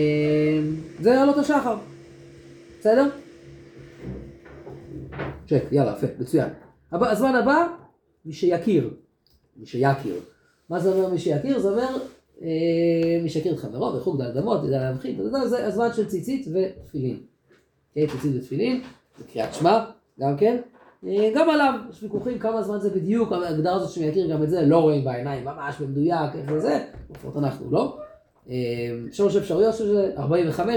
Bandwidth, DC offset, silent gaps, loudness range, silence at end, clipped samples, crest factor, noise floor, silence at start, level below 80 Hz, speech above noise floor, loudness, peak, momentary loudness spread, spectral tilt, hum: 19 kHz; under 0.1%; none; 5 LU; 0 s; under 0.1%; 18 dB; -63 dBFS; 0 s; -56 dBFS; 41 dB; -23 LUFS; -6 dBFS; 15 LU; -7.5 dB/octave; none